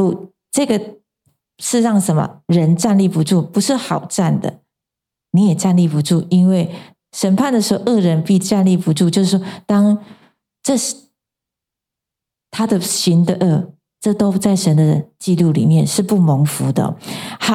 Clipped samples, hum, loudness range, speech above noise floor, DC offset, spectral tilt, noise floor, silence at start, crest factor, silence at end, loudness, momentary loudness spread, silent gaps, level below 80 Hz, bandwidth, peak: under 0.1%; none; 4 LU; 70 dB; under 0.1%; -6 dB/octave; -84 dBFS; 0 s; 14 dB; 0 s; -16 LUFS; 9 LU; none; -58 dBFS; 15.5 kHz; -2 dBFS